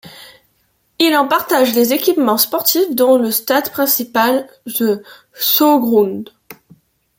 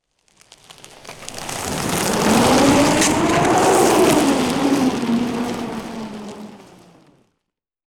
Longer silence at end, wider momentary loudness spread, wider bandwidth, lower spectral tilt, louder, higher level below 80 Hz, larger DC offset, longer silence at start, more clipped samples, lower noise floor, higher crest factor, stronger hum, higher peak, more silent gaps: second, 0.65 s vs 1.4 s; second, 8 LU vs 19 LU; second, 17 kHz vs 20 kHz; about the same, -3 dB/octave vs -4 dB/octave; first, -14 LUFS vs -17 LUFS; second, -64 dBFS vs -44 dBFS; neither; second, 0.05 s vs 0.7 s; neither; second, -61 dBFS vs -79 dBFS; about the same, 16 dB vs 16 dB; neither; first, 0 dBFS vs -4 dBFS; neither